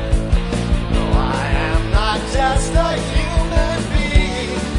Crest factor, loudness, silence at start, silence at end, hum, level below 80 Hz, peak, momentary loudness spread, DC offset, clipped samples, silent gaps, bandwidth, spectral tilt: 14 dB; -18 LUFS; 0 s; 0 s; none; -18 dBFS; -2 dBFS; 3 LU; under 0.1%; under 0.1%; none; 11 kHz; -5.5 dB/octave